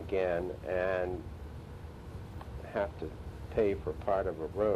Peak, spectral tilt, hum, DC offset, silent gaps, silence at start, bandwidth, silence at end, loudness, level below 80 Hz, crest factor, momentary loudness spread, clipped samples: -16 dBFS; -8 dB/octave; none; under 0.1%; none; 0 s; 13.5 kHz; 0 s; -35 LUFS; -48 dBFS; 18 dB; 15 LU; under 0.1%